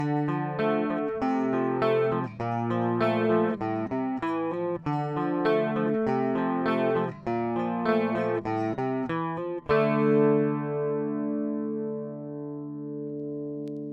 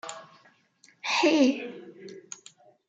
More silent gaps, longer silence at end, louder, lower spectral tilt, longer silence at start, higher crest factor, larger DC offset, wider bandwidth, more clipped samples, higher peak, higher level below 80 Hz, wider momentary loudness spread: neither; second, 0 s vs 0.7 s; second, -28 LUFS vs -25 LUFS; first, -9 dB/octave vs -2.5 dB/octave; about the same, 0 s vs 0.05 s; about the same, 16 dB vs 20 dB; neither; second, 7.2 kHz vs 9.4 kHz; neither; about the same, -10 dBFS vs -10 dBFS; first, -62 dBFS vs -82 dBFS; second, 10 LU vs 24 LU